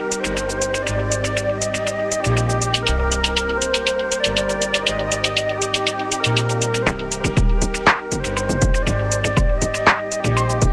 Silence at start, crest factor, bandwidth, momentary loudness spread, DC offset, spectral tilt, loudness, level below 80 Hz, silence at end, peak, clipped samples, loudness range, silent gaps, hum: 0 s; 20 dB; 13 kHz; 4 LU; under 0.1%; -4 dB/octave; -20 LUFS; -26 dBFS; 0 s; 0 dBFS; under 0.1%; 1 LU; none; none